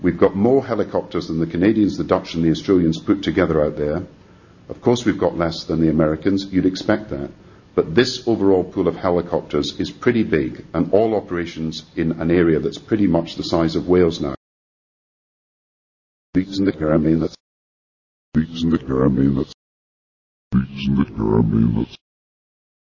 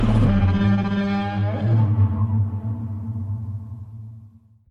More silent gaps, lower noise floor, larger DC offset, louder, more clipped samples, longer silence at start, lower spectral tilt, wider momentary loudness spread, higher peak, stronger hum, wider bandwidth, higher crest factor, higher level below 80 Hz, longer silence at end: first, 14.37-16.33 s, 17.40-18.32 s, 19.54-20.51 s vs none; about the same, -47 dBFS vs -48 dBFS; neither; first, -19 LUFS vs -22 LUFS; neither; about the same, 0 s vs 0 s; second, -7 dB/octave vs -9.5 dB/octave; second, 8 LU vs 18 LU; first, -2 dBFS vs -6 dBFS; neither; first, 7.4 kHz vs 5.4 kHz; about the same, 18 dB vs 14 dB; second, -40 dBFS vs -34 dBFS; first, 0.9 s vs 0.4 s